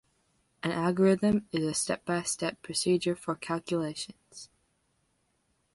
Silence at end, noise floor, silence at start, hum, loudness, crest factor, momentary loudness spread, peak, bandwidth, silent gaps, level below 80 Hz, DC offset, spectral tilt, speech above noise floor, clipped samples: 1.3 s; -74 dBFS; 0.65 s; none; -30 LUFS; 18 dB; 15 LU; -12 dBFS; 11.5 kHz; none; -64 dBFS; under 0.1%; -4.5 dB/octave; 45 dB; under 0.1%